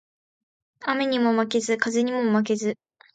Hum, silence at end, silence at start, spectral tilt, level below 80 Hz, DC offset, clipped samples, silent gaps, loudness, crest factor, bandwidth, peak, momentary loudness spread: none; 0.4 s; 0.8 s; -4.5 dB/octave; -74 dBFS; under 0.1%; under 0.1%; none; -24 LUFS; 18 dB; 9.2 kHz; -6 dBFS; 8 LU